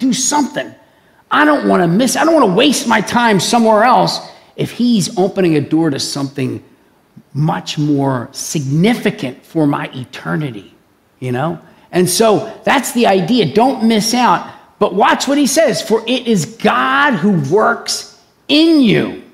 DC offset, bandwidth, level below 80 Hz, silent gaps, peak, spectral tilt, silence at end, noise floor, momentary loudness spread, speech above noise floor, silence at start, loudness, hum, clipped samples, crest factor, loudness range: under 0.1%; 16 kHz; -56 dBFS; none; 0 dBFS; -4.5 dB/octave; 0.1 s; -48 dBFS; 11 LU; 35 dB; 0 s; -13 LUFS; none; under 0.1%; 14 dB; 6 LU